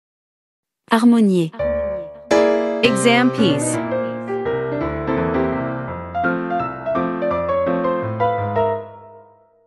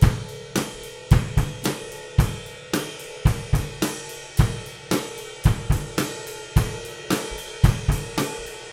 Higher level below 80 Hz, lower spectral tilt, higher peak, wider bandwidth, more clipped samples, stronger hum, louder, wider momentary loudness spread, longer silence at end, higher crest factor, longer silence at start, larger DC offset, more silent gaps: second, -44 dBFS vs -30 dBFS; about the same, -5.5 dB/octave vs -5.5 dB/octave; about the same, 0 dBFS vs 0 dBFS; second, 12 kHz vs 17 kHz; neither; neither; first, -19 LUFS vs -25 LUFS; about the same, 10 LU vs 12 LU; first, 0.45 s vs 0 s; about the same, 20 dB vs 22 dB; first, 0.9 s vs 0 s; neither; neither